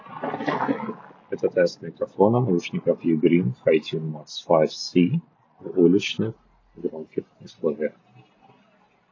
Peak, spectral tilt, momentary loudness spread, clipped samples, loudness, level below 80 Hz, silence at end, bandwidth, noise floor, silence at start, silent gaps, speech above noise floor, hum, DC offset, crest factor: -2 dBFS; -7 dB/octave; 14 LU; under 0.1%; -24 LUFS; -66 dBFS; 1.2 s; 7.4 kHz; -60 dBFS; 0.05 s; none; 38 dB; none; under 0.1%; 22 dB